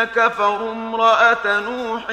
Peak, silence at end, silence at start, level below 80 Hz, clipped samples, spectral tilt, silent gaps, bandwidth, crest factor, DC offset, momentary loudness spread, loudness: -2 dBFS; 0 s; 0 s; -56 dBFS; under 0.1%; -3 dB/octave; none; 9.4 kHz; 14 dB; under 0.1%; 11 LU; -17 LUFS